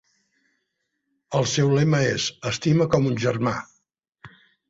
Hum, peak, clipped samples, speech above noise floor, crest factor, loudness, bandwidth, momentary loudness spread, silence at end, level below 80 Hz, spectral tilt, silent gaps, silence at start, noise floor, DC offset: none; -6 dBFS; under 0.1%; 56 dB; 18 dB; -22 LUFS; 8 kHz; 7 LU; 0.4 s; -56 dBFS; -5.5 dB/octave; none; 1.3 s; -77 dBFS; under 0.1%